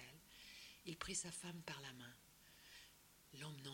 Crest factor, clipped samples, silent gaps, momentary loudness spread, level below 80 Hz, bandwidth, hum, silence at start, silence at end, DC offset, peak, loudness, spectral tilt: 24 dB; under 0.1%; none; 18 LU; -74 dBFS; 16.5 kHz; none; 0 s; 0 s; under 0.1%; -30 dBFS; -52 LUFS; -2.5 dB/octave